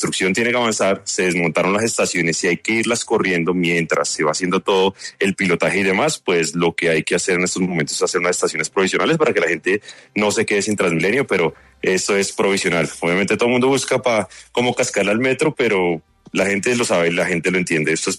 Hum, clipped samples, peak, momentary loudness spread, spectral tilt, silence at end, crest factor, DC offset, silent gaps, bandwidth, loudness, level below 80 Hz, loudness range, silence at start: none; under 0.1%; -4 dBFS; 3 LU; -4 dB/octave; 0 s; 14 dB; under 0.1%; none; 13.5 kHz; -18 LUFS; -56 dBFS; 1 LU; 0 s